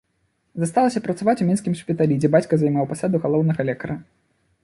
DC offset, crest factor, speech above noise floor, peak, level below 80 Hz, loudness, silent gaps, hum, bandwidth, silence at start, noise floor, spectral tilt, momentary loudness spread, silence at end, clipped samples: under 0.1%; 18 dB; 49 dB; -4 dBFS; -58 dBFS; -21 LUFS; none; none; 11.5 kHz; 0.55 s; -69 dBFS; -7.5 dB/octave; 10 LU; 0.6 s; under 0.1%